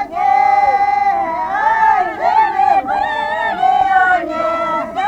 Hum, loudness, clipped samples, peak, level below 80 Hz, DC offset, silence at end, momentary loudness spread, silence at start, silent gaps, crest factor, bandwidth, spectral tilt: none; -14 LUFS; under 0.1%; -2 dBFS; -48 dBFS; under 0.1%; 0 s; 6 LU; 0 s; none; 12 dB; 8.4 kHz; -4 dB/octave